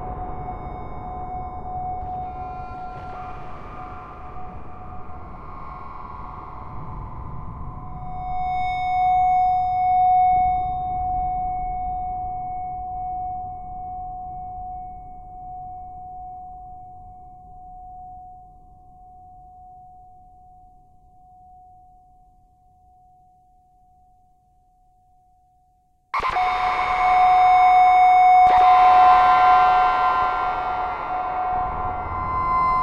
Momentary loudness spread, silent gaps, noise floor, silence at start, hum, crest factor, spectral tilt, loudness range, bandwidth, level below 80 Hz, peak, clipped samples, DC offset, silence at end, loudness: 25 LU; none; -61 dBFS; 0 s; none; 18 dB; -5.5 dB/octave; 23 LU; 7 kHz; -40 dBFS; -4 dBFS; under 0.1%; under 0.1%; 0 s; -19 LUFS